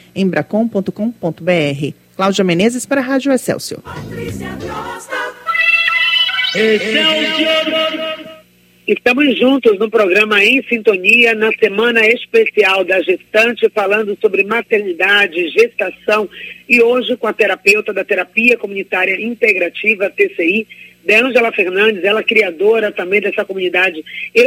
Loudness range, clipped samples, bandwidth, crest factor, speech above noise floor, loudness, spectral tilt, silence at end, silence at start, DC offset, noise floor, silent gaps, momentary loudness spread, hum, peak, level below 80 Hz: 5 LU; under 0.1%; 16.5 kHz; 14 dB; 33 dB; -13 LUFS; -4 dB/octave; 0 s; 0.15 s; under 0.1%; -47 dBFS; none; 12 LU; 60 Hz at -55 dBFS; 0 dBFS; -54 dBFS